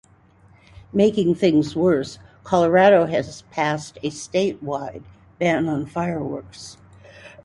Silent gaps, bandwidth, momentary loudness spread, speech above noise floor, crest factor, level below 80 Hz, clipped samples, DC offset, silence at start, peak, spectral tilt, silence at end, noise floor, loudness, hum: none; 11.5 kHz; 19 LU; 33 dB; 18 dB; -54 dBFS; under 0.1%; under 0.1%; 0.95 s; -4 dBFS; -6 dB/octave; 0.15 s; -53 dBFS; -21 LUFS; none